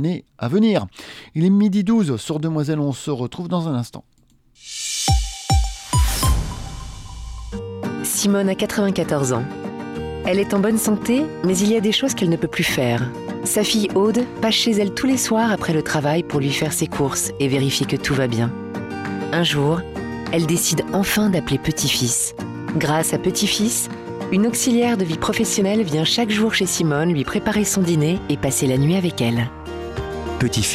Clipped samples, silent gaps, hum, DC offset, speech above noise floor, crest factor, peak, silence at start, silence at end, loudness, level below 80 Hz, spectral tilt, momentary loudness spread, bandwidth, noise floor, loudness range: under 0.1%; none; none; under 0.1%; 37 dB; 14 dB; -6 dBFS; 0 s; 0 s; -20 LUFS; -34 dBFS; -4.5 dB/octave; 11 LU; 16.5 kHz; -56 dBFS; 4 LU